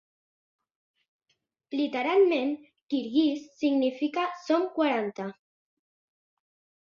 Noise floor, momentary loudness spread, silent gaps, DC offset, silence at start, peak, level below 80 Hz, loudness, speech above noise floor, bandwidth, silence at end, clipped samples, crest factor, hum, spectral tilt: -77 dBFS; 12 LU; 2.82-2.87 s; under 0.1%; 1.7 s; -12 dBFS; -78 dBFS; -27 LUFS; 50 dB; 7.4 kHz; 1.5 s; under 0.1%; 16 dB; none; -5.5 dB/octave